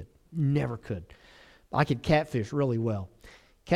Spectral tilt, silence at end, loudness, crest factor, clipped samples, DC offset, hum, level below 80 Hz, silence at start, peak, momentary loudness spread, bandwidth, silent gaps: -7.5 dB/octave; 0 s; -29 LUFS; 20 dB; under 0.1%; under 0.1%; none; -52 dBFS; 0 s; -10 dBFS; 13 LU; 11.5 kHz; none